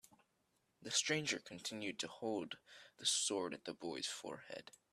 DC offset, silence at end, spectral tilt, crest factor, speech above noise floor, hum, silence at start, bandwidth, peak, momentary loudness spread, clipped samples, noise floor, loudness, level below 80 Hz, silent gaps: under 0.1%; 0.2 s; -1.5 dB/octave; 22 dB; 38 dB; none; 0.8 s; 14 kHz; -22 dBFS; 17 LU; under 0.1%; -81 dBFS; -41 LUFS; -86 dBFS; none